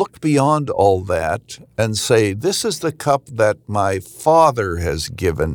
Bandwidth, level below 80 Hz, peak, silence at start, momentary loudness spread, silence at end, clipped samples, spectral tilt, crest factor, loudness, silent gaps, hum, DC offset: over 20 kHz; -44 dBFS; -2 dBFS; 0 s; 7 LU; 0 s; under 0.1%; -5 dB/octave; 16 dB; -18 LUFS; none; none; under 0.1%